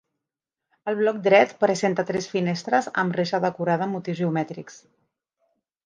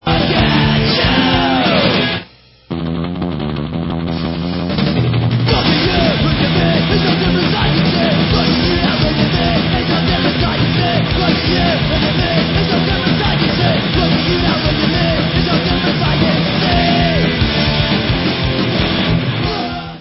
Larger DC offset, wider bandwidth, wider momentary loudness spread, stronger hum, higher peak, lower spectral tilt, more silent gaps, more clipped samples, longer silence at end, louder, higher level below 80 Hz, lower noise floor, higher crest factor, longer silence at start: neither; first, 9.8 kHz vs 5.8 kHz; first, 10 LU vs 7 LU; neither; second, -4 dBFS vs 0 dBFS; second, -5.5 dB/octave vs -9.5 dB/octave; neither; neither; first, 1.1 s vs 0 s; second, -23 LUFS vs -14 LUFS; second, -70 dBFS vs -26 dBFS; first, -87 dBFS vs -39 dBFS; first, 20 dB vs 14 dB; first, 0.85 s vs 0.05 s